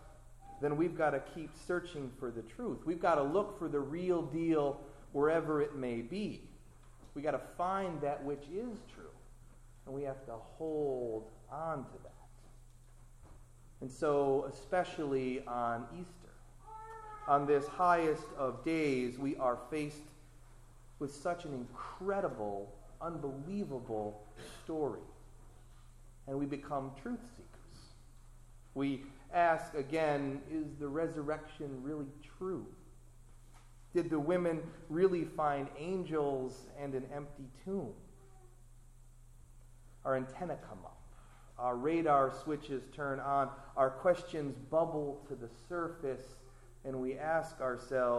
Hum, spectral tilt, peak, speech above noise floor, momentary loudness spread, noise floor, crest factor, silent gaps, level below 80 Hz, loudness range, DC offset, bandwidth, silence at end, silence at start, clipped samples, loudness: none; -7 dB/octave; -16 dBFS; 21 dB; 17 LU; -57 dBFS; 22 dB; none; -58 dBFS; 9 LU; under 0.1%; 13 kHz; 0 s; 0 s; under 0.1%; -37 LUFS